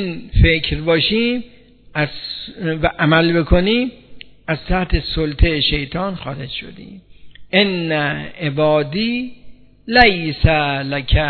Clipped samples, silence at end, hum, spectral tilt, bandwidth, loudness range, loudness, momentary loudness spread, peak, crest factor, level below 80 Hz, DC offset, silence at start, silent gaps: under 0.1%; 0 s; none; -8.5 dB/octave; 5.6 kHz; 3 LU; -17 LUFS; 13 LU; 0 dBFS; 18 dB; -26 dBFS; under 0.1%; 0 s; none